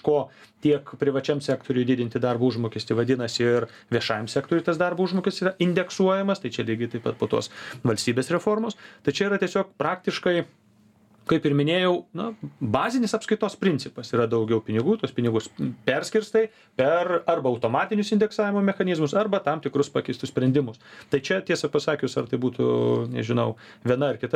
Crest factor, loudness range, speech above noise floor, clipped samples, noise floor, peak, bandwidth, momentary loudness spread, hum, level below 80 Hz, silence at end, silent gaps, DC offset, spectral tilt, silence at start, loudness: 20 dB; 2 LU; 34 dB; under 0.1%; -58 dBFS; -4 dBFS; 13.5 kHz; 6 LU; none; -64 dBFS; 0.05 s; none; under 0.1%; -6 dB/octave; 0.05 s; -25 LUFS